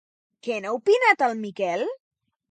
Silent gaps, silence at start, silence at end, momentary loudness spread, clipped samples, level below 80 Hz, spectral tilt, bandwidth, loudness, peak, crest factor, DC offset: none; 0.45 s; 0.55 s; 15 LU; under 0.1%; -82 dBFS; -4 dB/octave; 9.2 kHz; -23 LUFS; -4 dBFS; 22 dB; under 0.1%